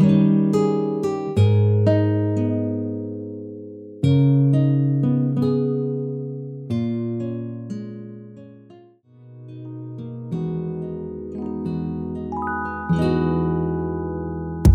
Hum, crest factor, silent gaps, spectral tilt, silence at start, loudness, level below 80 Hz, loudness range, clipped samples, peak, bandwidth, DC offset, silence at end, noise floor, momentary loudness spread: none; 20 dB; none; -9 dB/octave; 0 s; -22 LUFS; -36 dBFS; 12 LU; under 0.1%; -2 dBFS; 11 kHz; under 0.1%; 0 s; -49 dBFS; 17 LU